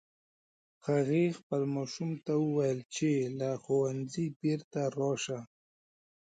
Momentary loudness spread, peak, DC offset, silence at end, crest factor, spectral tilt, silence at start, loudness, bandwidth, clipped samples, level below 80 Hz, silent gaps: 7 LU; -18 dBFS; under 0.1%; 0.9 s; 16 dB; -6.5 dB/octave; 0.85 s; -33 LUFS; 9.4 kHz; under 0.1%; -76 dBFS; 1.43-1.50 s, 2.85-2.89 s, 4.36-4.40 s, 4.64-4.71 s